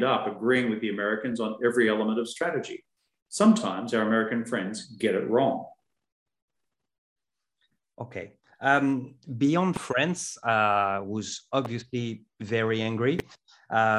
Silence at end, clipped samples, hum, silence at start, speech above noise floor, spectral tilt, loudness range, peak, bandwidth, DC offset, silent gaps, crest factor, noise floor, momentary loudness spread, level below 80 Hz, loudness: 0 s; under 0.1%; none; 0 s; 59 dB; -5 dB/octave; 6 LU; -8 dBFS; 12 kHz; under 0.1%; 3.22-3.26 s, 6.12-6.26 s, 6.42-6.48 s, 6.98-7.16 s; 20 dB; -85 dBFS; 14 LU; -66 dBFS; -27 LUFS